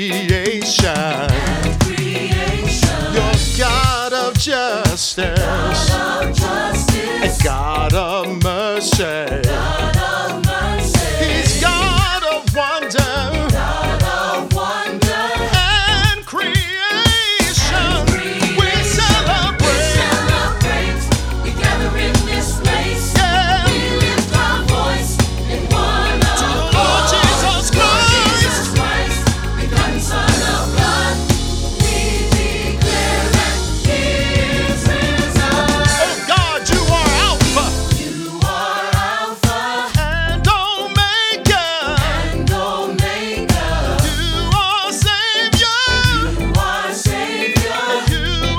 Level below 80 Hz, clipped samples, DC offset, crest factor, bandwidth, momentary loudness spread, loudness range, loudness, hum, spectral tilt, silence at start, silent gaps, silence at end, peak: -22 dBFS; under 0.1%; under 0.1%; 14 dB; 18 kHz; 5 LU; 3 LU; -15 LUFS; none; -4 dB/octave; 0 s; none; 0 s; 0 dBFS